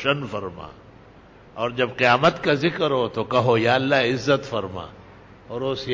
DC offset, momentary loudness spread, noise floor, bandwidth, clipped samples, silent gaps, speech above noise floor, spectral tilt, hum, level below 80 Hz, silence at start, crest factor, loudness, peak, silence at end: under 0.1%; 17 LU; -48 dBFS; 7.6 kHz; under 0.1%; none; 26 dB; -6 dB/octave; none; -54 dBFS; 0 s; 18 dB; -21 LUFS; -4 dBFS; 0 s